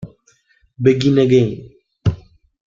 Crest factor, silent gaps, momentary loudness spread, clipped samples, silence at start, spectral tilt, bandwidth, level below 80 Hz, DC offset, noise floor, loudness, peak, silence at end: 16 dB; none; 21 LU; under 0.1%; 0 s; -7.5 dB/octave; 7.4 kHz; -46 dBFS; under 0.1%; -58 dBFS; -16 LUFS; -2 dBFS; 0.5 s